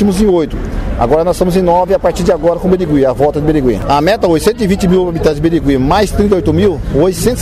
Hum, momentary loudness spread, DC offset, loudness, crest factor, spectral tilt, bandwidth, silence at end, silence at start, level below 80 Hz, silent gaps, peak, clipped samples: none; 2 LU; 0.3%; -12 LUFS; 10 dB; -6.5 dB/octave; 15.5 kHz; 0 s; 0 s; -24 dBFS; none; -2 dBFS; under 0.1%